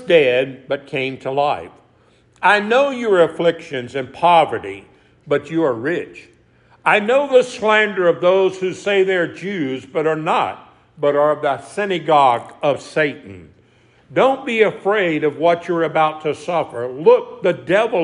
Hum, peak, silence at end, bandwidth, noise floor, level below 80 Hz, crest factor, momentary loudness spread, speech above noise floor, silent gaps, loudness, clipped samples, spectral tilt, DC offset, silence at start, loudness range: none; 0 dBFS; 0 s; 10.5 kHz; -54 dBFS; -64 dBFS; 16 dB; 10 LU; 37 dB; none; -17 LUFS; under 0.1%; -5.5 dB/octave; under 0.1%; 0 s; 3 LU